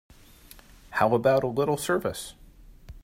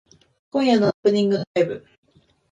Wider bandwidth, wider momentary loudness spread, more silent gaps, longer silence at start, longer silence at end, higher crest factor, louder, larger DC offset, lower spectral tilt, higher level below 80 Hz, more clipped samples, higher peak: first, 16 kHz vs 9.2 kHz; first, 13 LU vs 8 LU; second, none vs 0.94-1.03 s, 1.47-1.55 s; first, 0.9 s vs 0.55 s; second, 0.05 s vs 0.75 s; about the same, 20 dB vs 16 dB; second, -25 LUFS vs -21 LUFS; neither; second, -5 dB/octave vs -6.5 dB/octave; first, -52 dBFS vs -64 dBFS; neither; about the same, -8 dBFS vs -6 dBFS